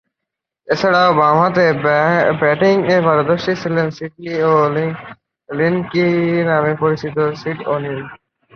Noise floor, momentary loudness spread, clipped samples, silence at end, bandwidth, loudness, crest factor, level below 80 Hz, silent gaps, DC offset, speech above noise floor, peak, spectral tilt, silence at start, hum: -81 dBFS; 11 LU; under 0.1%; 0.4 s; 6.8 kHz; -15 LUFS; 14 dB; -56 dBFS; none; under 0.1%; 66 dB; 0 dBFS; -7 dB/octave; 0.7 s; none